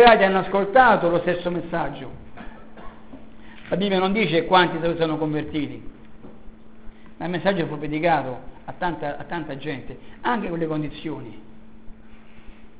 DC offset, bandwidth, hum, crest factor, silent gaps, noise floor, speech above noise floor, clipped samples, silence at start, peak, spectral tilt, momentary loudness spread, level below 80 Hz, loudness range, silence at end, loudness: 1%; 4 kHz; none; 22 dB; none; -45 dBFS; 24 dB; under 0.1%; 0 s; 0 dBFS; -9.5 dB/octave; 24 LU; -48 dBFS; 6 LU; 0.2 s; -22 LUFS